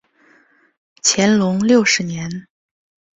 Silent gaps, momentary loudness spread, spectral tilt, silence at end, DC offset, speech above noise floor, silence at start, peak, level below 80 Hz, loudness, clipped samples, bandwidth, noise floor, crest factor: none; 14 LU; -3.5 dB/octave; 0.75 s; under 0.1%; 39 dB; 1.05 s; -2 dBFS; -58 dBFS; -15 LUFS; under 0.1%; 8.4 kHz; -54 dBFS; 18 dB